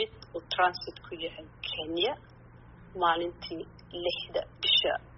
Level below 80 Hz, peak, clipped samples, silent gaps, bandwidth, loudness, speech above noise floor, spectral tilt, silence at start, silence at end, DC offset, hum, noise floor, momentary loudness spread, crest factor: -58 dBFS; -12 dBFS; under 0.1%; none; 6 kHz; -30 LUFS; 21 dB; 0 dB/octave; 0 s; 0 s; under 0.1%; none; -52 dBFS; 17 LU; 20 dB